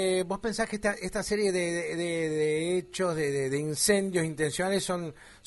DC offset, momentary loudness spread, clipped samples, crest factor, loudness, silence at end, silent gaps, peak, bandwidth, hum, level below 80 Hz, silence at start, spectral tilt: under 0.1%; 5 LU; under 0.1%; 18 dB; -29 LUFS; 0.1 s; none; -12 dBFS; 11.5 kHz; none; -56 dBFS; 0 s; -4 dB/octave